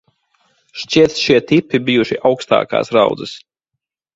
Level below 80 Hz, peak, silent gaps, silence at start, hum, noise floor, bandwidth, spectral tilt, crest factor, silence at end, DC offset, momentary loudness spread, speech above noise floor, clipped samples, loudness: -52 dBFS; 0 dBFS; none; 0.75 s; none; -79 dBFS; 7.8 kHz; -5 dB/octave; 16 dB; 0.8 s; under 0.1%; 17 LU; 65 dB; under 0.1%; -15 LUFS